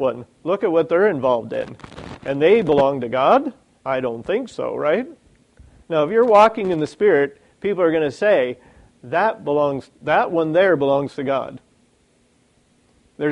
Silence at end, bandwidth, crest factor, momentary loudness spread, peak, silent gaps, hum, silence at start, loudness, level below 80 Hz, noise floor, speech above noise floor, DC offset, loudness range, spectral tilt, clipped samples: 0 s; 10.5 kHz; 18 dB; 13 LU; -2 dBFS; none; none; 0 s; -19 LUFS; -56 dBFS; -60 dBFS; 41 dB; under 0.1%; 4 LU; -6.5 dB/octave; under 0.1%